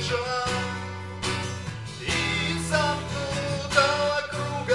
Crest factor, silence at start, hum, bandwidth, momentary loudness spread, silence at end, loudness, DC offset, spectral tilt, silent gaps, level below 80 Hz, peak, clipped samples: 20 dB; 0 s; none; 12 kHz; 11 LU; 0 s; -26 LUFS; 0.2%; -4 dB/octave; none; -50 dBFS; -6 dBFS; under 0.1%